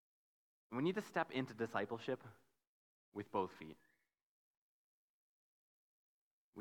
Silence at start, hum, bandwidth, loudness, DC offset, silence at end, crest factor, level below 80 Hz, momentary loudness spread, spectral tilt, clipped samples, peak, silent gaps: 0.7 s; none; 19 kHz; -43 LUFS; under 0.1%; 0 s; 24 dB; -86 dBFS; 16 LU; -6.5 dB/octave; under 0.1%; -24 dBFS; 2.67-3.12 s, 4.23-6.53 s